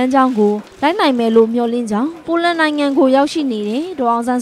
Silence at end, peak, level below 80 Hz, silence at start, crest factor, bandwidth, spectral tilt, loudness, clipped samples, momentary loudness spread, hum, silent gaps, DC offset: 0 s; 0 dBFS; -58 dBFS; 0 s; 14 dB; 13 kHz; -5.5 dB/octave; -15 LUFS; under 0.1%; 7 LU; none; none; under 0.1%